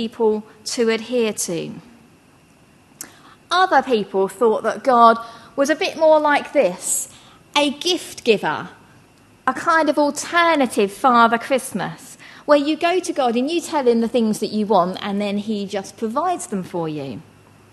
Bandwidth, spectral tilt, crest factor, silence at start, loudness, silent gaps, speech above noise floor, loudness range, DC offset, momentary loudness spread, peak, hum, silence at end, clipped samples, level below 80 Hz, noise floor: 13 kHz; -3.5 dB/octave; 18 dB; 0 s; -19 LUFS; none; 33 dB; 5 LU; under 0.1%; 13 LU; 0 dBFS; none; 0.5 s; under 0.1%; -64 dBFS; -52 dBFS